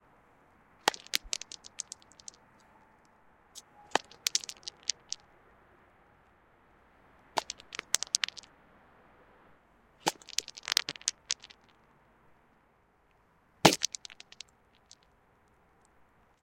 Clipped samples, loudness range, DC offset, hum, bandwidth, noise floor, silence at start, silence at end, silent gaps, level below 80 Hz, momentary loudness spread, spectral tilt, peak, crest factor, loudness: under 0.1%; 5 LU; under 0.1%; none; 16.5 kHz; -68 dBFS; 0.85 s; 2.3 s; none; -68 dBFS; 22 LU; -1.5 dB/octave; 0 dBFS; 38 dB; -32 LUFS